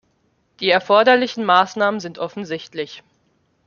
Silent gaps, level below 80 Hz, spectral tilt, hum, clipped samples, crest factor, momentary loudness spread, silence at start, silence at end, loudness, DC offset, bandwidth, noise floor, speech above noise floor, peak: none; -68 dBFS; -4.5 dB/octave; none; under 0.1%; 18 dB; 15 LU; 0.6 s; 0.65 s; -18 LUFS; under 0.1%; 7.2 kHz; -64 dBFS; 46 dB; -2 dBFS